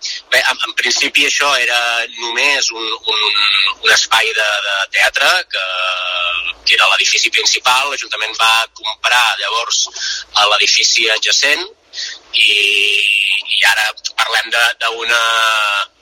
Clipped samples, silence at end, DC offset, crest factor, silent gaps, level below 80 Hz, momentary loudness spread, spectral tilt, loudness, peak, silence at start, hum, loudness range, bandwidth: under 0.1%; 0.15 s; under 0.1%; 14 dB; none; -58 dBFS; 8 LU; 2.5 dB/octave; -12 LUFS; 0 dBFS; 0 s; none; 2 LU; 17 kHz